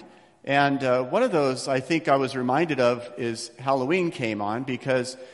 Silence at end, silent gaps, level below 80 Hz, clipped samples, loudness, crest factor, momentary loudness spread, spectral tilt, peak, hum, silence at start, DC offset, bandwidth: 0 s; none; -66 dBFS; under 0.1%; -24 LUFS; 18 dB; 8 LU; -5.5 dB/octave; -6 dBFS; none; 0 s; under 0.1%; 12 kHz